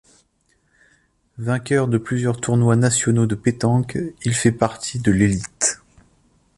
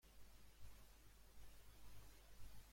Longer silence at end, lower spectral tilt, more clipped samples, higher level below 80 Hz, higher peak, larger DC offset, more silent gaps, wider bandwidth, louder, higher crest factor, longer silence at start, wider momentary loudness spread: first, 0.85 s vs 0 s; first, -5.5 dB/octave vs -3.5 dB/octave; neither; first, -46 dBFS vs -66 dBFS; first, -2 dBFS vs -44 dBFS; neither; neither; second, 11.5 kHz vs 16.5 kHz; first, -20 LUFS vs -67 LUFS; about the same, 18 dB vs 14 dB; first, 1.4 s vs 0.05 s; first, 8 LU vs 3 LU